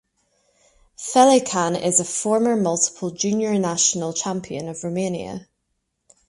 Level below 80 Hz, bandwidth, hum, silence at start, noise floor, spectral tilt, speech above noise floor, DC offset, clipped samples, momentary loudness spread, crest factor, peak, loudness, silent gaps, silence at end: -62 dBFS; 11.5 kHz; none; 1 s; -74 dBFS; -3.5 dB/octave; 54 dB; under 0.1%; under 0.1%; 14 LU; 20 dB; -2 dBFS; -20 LUFS; none; 0.85 s